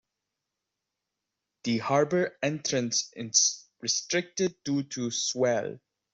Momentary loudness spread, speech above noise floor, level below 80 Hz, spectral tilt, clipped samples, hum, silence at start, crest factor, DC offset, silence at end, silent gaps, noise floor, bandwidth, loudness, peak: 8 LU; 58 dB; -72 dBFS; -3 dB/octave; under 0.1%; none; 1.65 s; 22 dB; under 0.1%; 0.35 s; none; -86 dBFS; 8.2 kHz; -28 LUFS; -8 dBFS